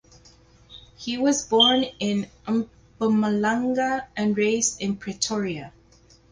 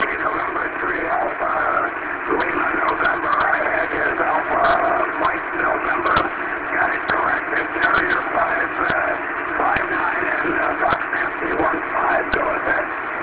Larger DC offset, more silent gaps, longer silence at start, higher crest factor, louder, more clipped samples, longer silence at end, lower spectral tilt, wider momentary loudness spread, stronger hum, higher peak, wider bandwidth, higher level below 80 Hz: neither; neither; first, 0.7 s vs 0 s; about the same, 20 dB vs 18 dB; second, -23 LUFS vs -19 LUFS; neither; first, 0.65 s vs 0 s; second, -3.5 dB/octave vs -8 dB/octave; first, 13 LU vs 4 LU; first, 60 Hz at -50 dBFS vs none; about the same, -4 dBFS vs -2 dBFS; first, 10 kHz vs 4 kHz; second, -58 dBFS vs -46 dBFS